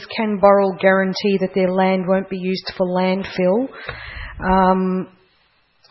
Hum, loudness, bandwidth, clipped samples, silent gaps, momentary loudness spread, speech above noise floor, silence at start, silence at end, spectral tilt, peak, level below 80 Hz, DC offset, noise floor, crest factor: none; -18 LUFS; 6 kHz; under 0.1%; none; 13 LU; 42 dB; 0 s; 0.85 s; -8 dB/octave; 0 dBFS; -42 dBFS; under 0.1%; -60 dBFS; 18 dB